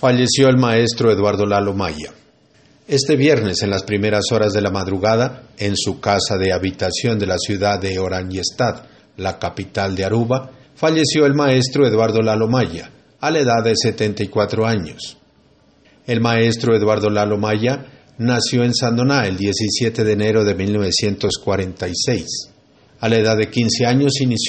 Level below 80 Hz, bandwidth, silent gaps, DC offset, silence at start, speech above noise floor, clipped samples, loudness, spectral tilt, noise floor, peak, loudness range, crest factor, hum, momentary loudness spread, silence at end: -50 dBFS; 8.8 kHz; none; under 0.1%; 0 s; 37 dB; under 0.1%; -17 LUFS; -5 dB/octave; -53 dBFS; -2 dBFS; 3 LU; 16 dB; none; 9 LU; 0 s